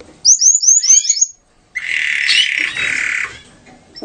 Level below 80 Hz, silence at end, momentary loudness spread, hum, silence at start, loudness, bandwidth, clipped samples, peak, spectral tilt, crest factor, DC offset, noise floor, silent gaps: -56 dBFS; 0.05 s; 13 LU; none; 0.25 s; -11 LUFS; 13 kHz; under 0.1%; 0 dBFS; 3.5 dB/octave; 16 dB; under 0.1%; -44 dBFS; none